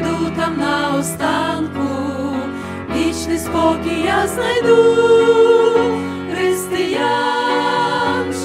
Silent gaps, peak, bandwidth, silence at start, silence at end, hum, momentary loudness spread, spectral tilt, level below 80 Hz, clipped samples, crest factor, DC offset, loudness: none; -2 dBFS; 16 kHz; 0 s; 0 s; none; 10 LU; -4.5 dB/octave; -44 dBFS; under 0.1%; 14 dB; under 0.1%; -16 LUFS